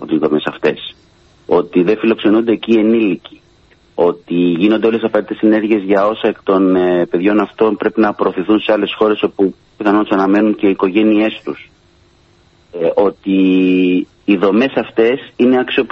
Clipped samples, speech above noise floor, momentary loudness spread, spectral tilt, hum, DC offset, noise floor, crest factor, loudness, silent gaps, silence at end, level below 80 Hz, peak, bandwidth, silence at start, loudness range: under 0.1%; 37 dB; 6 LU; -8 dB/octave; none; under 0.1%; -50 dBFS; 14 dB; -14 LUFS; none; 0.05 s; -54 dBFS; 0 dBFS; 6.2 kHz; 0 s; 2 LU